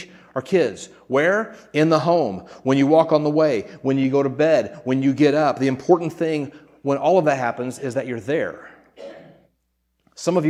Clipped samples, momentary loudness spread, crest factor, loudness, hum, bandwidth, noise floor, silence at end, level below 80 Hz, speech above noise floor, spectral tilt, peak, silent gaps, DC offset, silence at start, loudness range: under 0.1%; 13 LU; 18 dB; -20 LUFS; none; 12 kHz; -71 dBFS; 0 s; -66 dBFS; 51 dB; -6.5 dB/octave; -2 dBFS; none; under 0.1%; 0 s; 5 LU